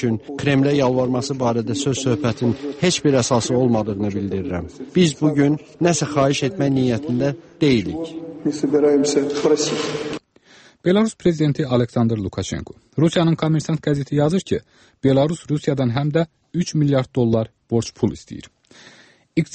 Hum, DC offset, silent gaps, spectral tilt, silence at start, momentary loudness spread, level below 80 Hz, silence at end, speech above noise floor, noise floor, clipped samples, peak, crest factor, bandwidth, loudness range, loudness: none; under 0.1%; none; -6 dB/octave; 0 s; 9 LU; -50 dBFS; 0 s; 31 dB; -50 dBFS; under 0.1%; -4 dBFS; 16 dB; 8.8 kHz; 2 LU; -20 LUFS